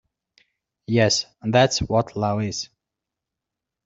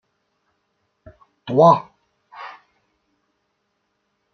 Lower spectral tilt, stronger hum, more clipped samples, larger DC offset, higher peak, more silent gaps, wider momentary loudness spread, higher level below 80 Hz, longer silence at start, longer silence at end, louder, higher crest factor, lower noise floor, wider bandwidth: second, -4.5 dB/octave vs -8 dB/octave; neither; neither; neither; about the same, -2 dBFS vs -2 dBFS; neither; second, 10 LU vs 25 LU; first, -50 dBFS vs -66 dBFS; second, 0.9 s vs 1.45 s; second, 1.2 s vs 1.85 s; second, -21 LUFS vs -16 LUFS; about the same, 22 dB vs 22 dB; first, -85 dBFS vs -72 dBFS; first, 8 kHz vs 6.6 kHz